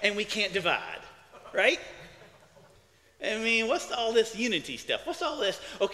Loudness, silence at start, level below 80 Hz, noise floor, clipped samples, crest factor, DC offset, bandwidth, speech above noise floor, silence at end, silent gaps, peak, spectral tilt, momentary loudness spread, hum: -28 LUFS; 0 s; -64 dBFS; -61 dBFS; under 0.1%; 22 dB; under 0.1%; 15 kHz; 32 dB; 0 s; none; -8 dBFS; -2.5 dB/octave; 10 LU; none